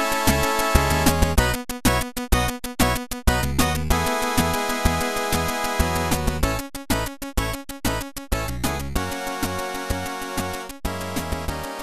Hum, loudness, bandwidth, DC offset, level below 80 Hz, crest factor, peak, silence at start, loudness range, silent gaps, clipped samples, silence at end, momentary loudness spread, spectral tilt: none; -23 LUFS; 14 kHz; under 0.1%; -30 dBFS; 20 dB; -2 dBFS; 0 s; 6 LU; none; under 0.1%; 0 s; 8 LU; -4 dB/octave